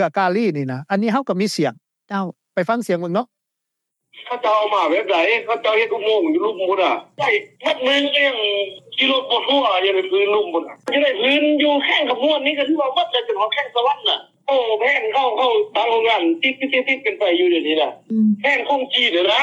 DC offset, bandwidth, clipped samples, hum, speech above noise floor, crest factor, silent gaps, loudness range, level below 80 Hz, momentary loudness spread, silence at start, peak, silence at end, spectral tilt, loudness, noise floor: under 0.1%; 12.5 kHz; under 0.1%; none; 61 dB; 16 dB; none; 4 LU; -86 dBFS; 7 LU; 0 s; -4 dBFS; 0 s; -4.5 dB/octave; -18 LUFS; -80 dBFS